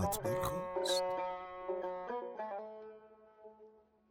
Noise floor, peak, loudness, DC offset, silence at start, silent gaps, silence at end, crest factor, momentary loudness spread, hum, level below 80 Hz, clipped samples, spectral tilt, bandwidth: -63 dBFS; -22 dBFS; -39 LUFS; under 0.1%; 0 s; none; 0.3 s; 18 dB; 23 LU; none; -62 dBFS; under 0.1%; -4 dB/octave; 16 kHz